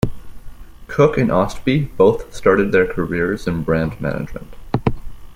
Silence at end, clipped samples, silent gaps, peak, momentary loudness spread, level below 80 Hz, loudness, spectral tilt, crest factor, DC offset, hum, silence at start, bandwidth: 0 s; under 0.1%; none; -2 dBFS; 11 LU; -34 dBFS; -18 LUFS; -7.5 dB/octave; 16 dB; under 0.1%; none; 0.05 s; 16 kHz